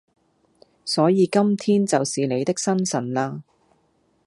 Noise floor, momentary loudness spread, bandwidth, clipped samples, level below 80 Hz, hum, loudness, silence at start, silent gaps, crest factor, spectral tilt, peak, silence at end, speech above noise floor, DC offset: -65 dBFS; 9 LU; 11.5 kHz; under 0.1%; -70 dBFS; none; -21 LUFS; 0.85 s; none; 18 dB; -5 dB/octave; -4 dBFS; 0.85 s; 44 dB; under 0.1%